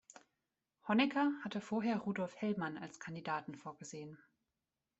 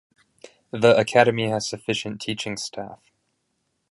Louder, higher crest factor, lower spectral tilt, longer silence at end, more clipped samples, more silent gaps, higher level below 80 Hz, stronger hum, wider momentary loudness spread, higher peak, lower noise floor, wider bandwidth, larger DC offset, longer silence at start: second, -38 LUFS vs -22 LUFS; about the same, 20 dB vs 22 dB; about the same, -5.5 dB/octave vs -4.5 dB/octave; about the same, 0.85 s vs 0.95 s; neither; neither; second, -82 dBFS vs -62 dBFS; neither; about the same, 16 LU vs 18 LU; second, -20 dBFS vs -2 dBFS; first, under -90 dBFS vs -74 dBFS; second, 8.2 kHz vs 11.5 kHz; neither; first, 0.85 s vs 0.45 s